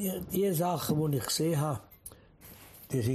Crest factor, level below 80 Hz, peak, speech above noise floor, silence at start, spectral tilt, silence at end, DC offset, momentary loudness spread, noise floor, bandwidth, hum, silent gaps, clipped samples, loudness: 14 dB; -58 dBFS; -18 dBFS; 23 dB; 0 s; -5.5 dB/octave; 0 s; under 0.1%; 21 LU; -54 dBFS; 15 kHz; none; none; under 0.1%; -31 LUFS